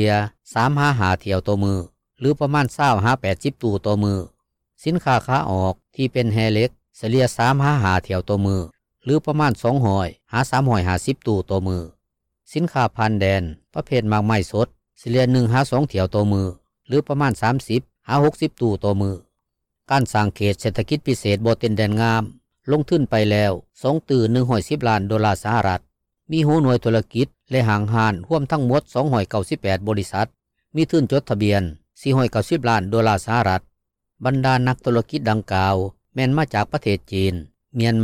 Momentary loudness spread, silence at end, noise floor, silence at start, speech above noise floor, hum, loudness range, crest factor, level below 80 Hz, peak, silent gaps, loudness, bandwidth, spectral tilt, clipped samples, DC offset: 7 LU; 0 s; -78 dBFS; 0 s; 59 dB; none; 2 LU; 12 dB; -48 dBFS; -8 dBFS; none; -20 LUFS; 15 kHz; -7 dB/octave; under 0.1%; under 0.1%